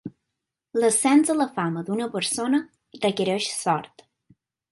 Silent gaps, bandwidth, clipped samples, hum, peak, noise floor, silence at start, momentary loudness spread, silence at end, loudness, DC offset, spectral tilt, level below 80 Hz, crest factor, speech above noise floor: none; 12 kHz; under 0.1%; none; -8 dBFS; -83 dBFS; 0.05 s; 9 LU; 0.85 s; -23 LUFS; under 0.1%; -4 dB/octave; -70 dBFS; 18 dB; 60 dB